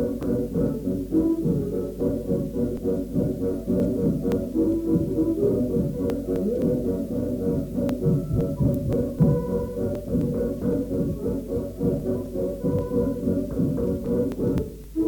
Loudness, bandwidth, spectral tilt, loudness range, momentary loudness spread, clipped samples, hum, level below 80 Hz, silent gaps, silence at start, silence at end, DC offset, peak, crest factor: -25 LUFS; 19 kHz; -9.5 dB/octave; 2 LU; 5 LU; under 0.1%; none; -38 dBFS; none; 0 s; 0 s; under 0.1%; -10 dBFS; 14 dB